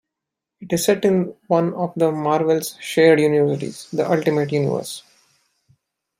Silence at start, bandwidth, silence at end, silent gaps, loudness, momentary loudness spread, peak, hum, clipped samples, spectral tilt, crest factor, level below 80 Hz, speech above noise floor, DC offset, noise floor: 0.6 s; 16.5 kHz; 1.2 s; none; -19 LUFS; 11 LU; -2 dBFS; none; under 0.1%; -5.5 dB/octave; 18 dB; -64 dBFS; 65 dB; under 0.1%; -84 dBFS